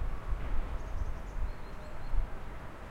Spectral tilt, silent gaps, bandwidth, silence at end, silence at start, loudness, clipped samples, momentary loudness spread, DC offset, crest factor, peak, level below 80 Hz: -6.5 dB/octave; none; 7 kHz; 0 s; 0 s; -42 LUFS; under 0.1%; 7 LU; under 0.1%; 16 dB; -18 dBFS; -36 dBFS